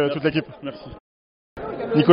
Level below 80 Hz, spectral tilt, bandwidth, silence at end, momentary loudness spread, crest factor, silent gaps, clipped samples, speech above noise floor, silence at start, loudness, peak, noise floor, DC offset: -52 dBFS; -5.5 dB/octave; 5.4 kHz; 0 s; 22 LU; 22 dB; 1.00-1.56 s; under 0.1%; over 65 dB; 0 s; -25 LUFS; 0 dBFS; under -90 dBFS; under 0.1%